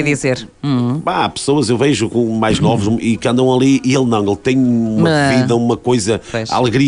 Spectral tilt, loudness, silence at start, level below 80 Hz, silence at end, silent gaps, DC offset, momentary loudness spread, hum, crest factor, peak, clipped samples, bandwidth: -5.5 dB/octave; -14 LUFS; 0 s; -44 dBFS; 0 s; none; under 0.1%; 5 LU; none; 10 dB; -4 dBFS; under 0.1%; 10.5 kHz